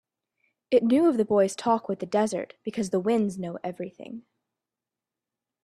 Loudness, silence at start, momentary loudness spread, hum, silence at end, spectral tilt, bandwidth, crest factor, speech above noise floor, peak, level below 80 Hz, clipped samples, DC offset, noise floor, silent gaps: -26 LUFS; 0.7 s; 16 LU; none; 1.45 s; -6 dB/octave; 13 kHz; 18 dB; 64 dB; -10 dBFS; -70 dBFS; under 0.1%; under 0.1%; -89 dBFS; none